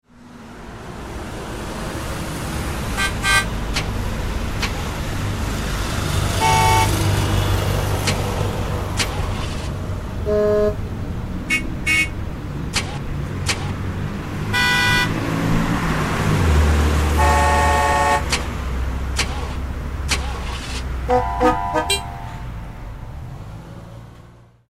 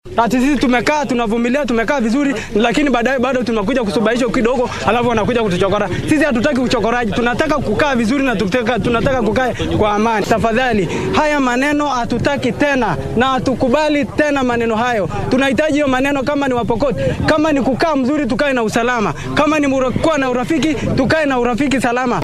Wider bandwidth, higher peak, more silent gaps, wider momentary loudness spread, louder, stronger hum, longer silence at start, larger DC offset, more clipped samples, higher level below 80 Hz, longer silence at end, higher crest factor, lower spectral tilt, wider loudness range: first, 16 kHz vs 14 kHz; second, -4 dBFS vs 0 dBFS; neither; first, 16 LU vs 3 LU; second, -20 LUFS vs -15 LUFS; neither; about the same, 0.1 s vs 0.05 s; first, 0.6% vs under 0.1%; neither; first, -26 dBFS vs -32 dBFS; first, 0.2 s vs 0 s; about the same, 18 dB vs 14 dB; about the same, -4.5 dB/octave vs -5.5 dB/octave; first, 5 LU vs 0 LU